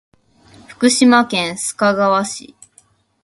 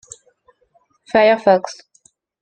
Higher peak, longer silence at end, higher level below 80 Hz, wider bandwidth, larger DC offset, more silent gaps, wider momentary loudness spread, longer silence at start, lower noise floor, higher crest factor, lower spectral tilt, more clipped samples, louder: about the same, 0 dBFS vs -2 dBFS; about the same, 0.8 s vs 0.7 s; about the same, -60 dBFS vs -60 dBFS; first, 11.5 kHz vs 9.2 kHz; neither; neither; second, 11 LU vs 20 LU; second, 0.7 s vs 1.15 s; second, -54 dBFS vs -60 dBFS; about the same, 18 dB vs 18 dB; second, -3 dB/octave vs -4.5 dB/octave; neither; about the same, -15 LUFS vs -15 LUFS